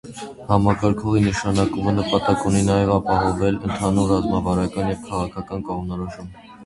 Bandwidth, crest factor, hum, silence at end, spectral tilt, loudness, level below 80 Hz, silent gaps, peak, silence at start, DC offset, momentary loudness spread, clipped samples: 11.5 kHz; 18 dB; none; 0 s; -6.5 dB/octave; -21 LUFS; -38 dBFS; none; -2 dBFS; 0.05 s; under 0.1%; 11 LU; under 0.1%